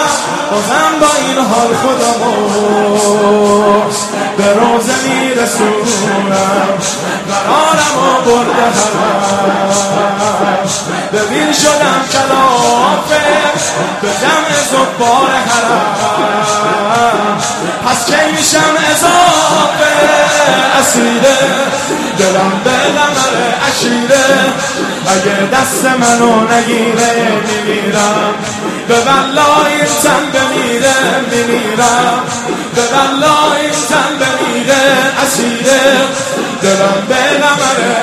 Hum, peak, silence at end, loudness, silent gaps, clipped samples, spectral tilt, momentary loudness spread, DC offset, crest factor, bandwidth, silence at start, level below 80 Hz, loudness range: none; 0 dBFS; 0 s; -10 LUFS; none; 0.2%; -3 dB/octave; 5 LU; under 0.1%; 10 dB; 14 kHz; 0 s; -46 dBFS; 2 LU